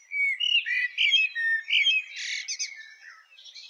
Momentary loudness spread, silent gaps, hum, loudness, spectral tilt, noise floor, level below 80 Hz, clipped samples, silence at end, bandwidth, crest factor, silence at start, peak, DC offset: 11 LU; none; none; -23 LUFS; 8.5 dB/octave; -51 dBFS; -82 dBFS; under 0.1%; 0 s; 11.5 kHz; 16 dB; 0.1 s; -12 dBFS; under 0.1%